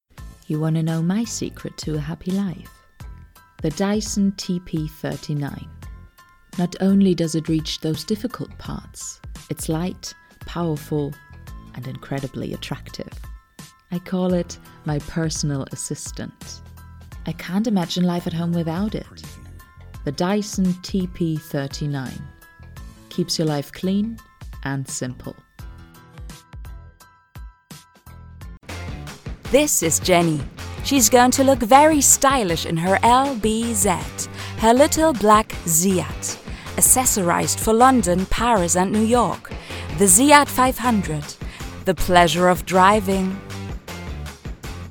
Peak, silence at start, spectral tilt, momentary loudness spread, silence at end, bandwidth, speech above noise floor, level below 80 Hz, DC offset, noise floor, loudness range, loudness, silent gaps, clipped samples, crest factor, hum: 0 dBFS; 0.15 s; -4 dB/octave; 20 LU; 0 s; 19 kHz; 29 dB; -38 dBFS; under 0.1%; -49 dBFS; 13 LU; -19 LUFS; none; under 0.1%; 22 dB; none